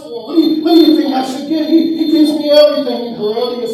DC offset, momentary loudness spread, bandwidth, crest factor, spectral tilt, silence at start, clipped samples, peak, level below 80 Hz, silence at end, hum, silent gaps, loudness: under 0.1%; 9 LU; 13 kHz; 12 dB; -5 dB/octave; 0 s; 0.3%; 0 dBFS; -62 dBFS; 0 s; none; none; -12 LUFS